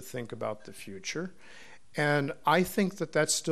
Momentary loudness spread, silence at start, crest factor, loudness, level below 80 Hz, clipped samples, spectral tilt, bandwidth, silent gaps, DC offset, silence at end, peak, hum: 16 LU; 0 s; 22 dB; -30 LUFS; -64 dBFS; under 0.1%; -4 dB/octave; 13.5 kHz; none; 0.4%; 0 s; -10 dBFS; none